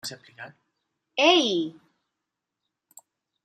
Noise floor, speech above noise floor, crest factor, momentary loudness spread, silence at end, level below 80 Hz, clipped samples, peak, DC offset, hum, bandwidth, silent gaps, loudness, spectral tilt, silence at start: -85 dBFS; 60 dB; 24 dB; 25 LU; 1.75 s; -82 dBFS; under 0.1%; -4 dBFS; under 0.1%; none; 15 kHz; none; -22 LUFS; -2.5 dB/octave; 0.05 s